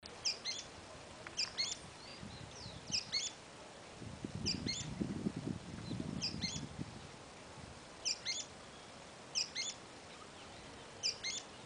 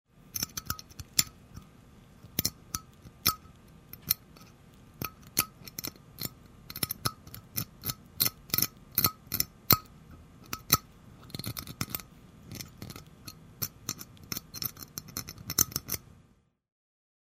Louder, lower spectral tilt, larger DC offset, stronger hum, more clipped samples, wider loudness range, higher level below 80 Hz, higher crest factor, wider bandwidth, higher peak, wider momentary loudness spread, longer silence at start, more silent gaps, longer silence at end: second, -41 LUFS vs -32 LUFS; about the same, -2.5 dB/octave vs -2 dB/octave; neither; neither; neither; second, 2 LU vs 10 LU; second, -64 dBFS vs -56 dBFS; second, 22 dB vs 34 dB; second, 12.5 kHz vs 16 kHz; second, -22 dBFS vs -2 dBFS; second, 15 LU vs 18 LU; second, 0 s vs 0.25 s; neither; second, 0 s vs 1.25 s